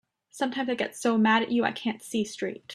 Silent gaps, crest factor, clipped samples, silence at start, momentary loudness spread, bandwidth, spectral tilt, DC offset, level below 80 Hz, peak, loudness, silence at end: none; 20 dB; under 0.1%; 0.35 s; 10 LU; 13 kHz; -4.5 dB/octave; under 0.1%; -72 dBFS; -8 dBFS; -27 LUFS; 0 s